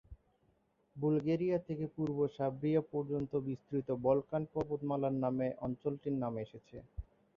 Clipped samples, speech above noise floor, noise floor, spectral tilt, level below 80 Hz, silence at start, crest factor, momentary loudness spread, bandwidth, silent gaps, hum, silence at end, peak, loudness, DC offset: under 0.1%; 39 dB; -75 dBFS; -9 dB/octave; -60 dBFS; 0.1 s; 20 dB; 11 LU; 6.8 kHz; none; none; 0.35 s; -18 dBFS; -36 LUFS; under 0.1%